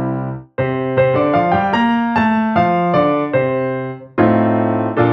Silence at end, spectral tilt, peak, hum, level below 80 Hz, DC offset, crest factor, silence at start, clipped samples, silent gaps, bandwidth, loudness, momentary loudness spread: 0 s; -9 dB/octave; 0 dBFS; none; -50 dBFS; under 0.1%; 14 dB; 0 s; under 0.1%; none; 6.2 kHz; -16 LUFS; 8 LU